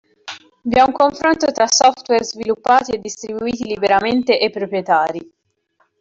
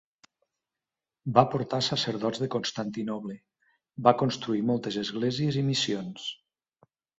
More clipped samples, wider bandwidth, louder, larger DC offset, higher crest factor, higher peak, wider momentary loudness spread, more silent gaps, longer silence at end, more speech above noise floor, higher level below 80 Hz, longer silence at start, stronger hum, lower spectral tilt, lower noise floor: neither; about the same, 7.8 kHz vs 8 kHz; first, -16 LUFS vs -28 LUFS; neither; second, 14 dB vs 26 dB; about the same, -2 dBFS vs -4 dBFS; about the same, 13 LU vs 14 LU; neither; about the same, 0.8 s vs 0.85 s; second, 47 dB vs 63 dB; first, -52 dBFS vs -66 dBFS; second, 0.25 s vs 1.25 s; neither; second, -2.5 dB/octave vs -5.5 dB/octave; second, -64 dBFS vs -90 dBFS